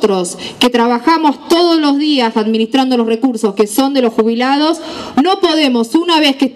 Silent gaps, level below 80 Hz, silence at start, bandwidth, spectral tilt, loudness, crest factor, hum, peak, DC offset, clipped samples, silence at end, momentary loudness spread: none; -56 dBFS; 0 s; 15 kHz; -4 dB/octave; -12 LUFS; 12 dB; none; 0 dBFS; under 0.1%; under 0.1%; 0.05 s; 4 LU